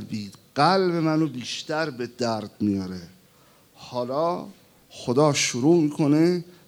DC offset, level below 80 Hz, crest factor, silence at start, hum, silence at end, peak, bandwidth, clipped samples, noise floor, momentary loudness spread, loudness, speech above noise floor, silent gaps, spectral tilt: under 0.1%; -70 dBFS; 20 dB; 0 s; none; 0.2 s; -6 dBFS; 16 kHz; under 0.1%; -56 dBFS; 14 LU; -23 LUFS; 33 dB; none; -5 dB/octave